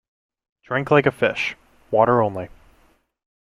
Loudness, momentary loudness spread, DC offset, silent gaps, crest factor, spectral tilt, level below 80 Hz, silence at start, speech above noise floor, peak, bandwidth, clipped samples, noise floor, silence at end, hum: -20 LUFS; 10 LU; under 0.1%; none; 20 dB; -6.5 dB/octave; -56 dBFS; 0.7 s; 41 dB; -2 dBFS; 12.5 kHz; under 0.1%; -60 dBFS; 1.1 s; none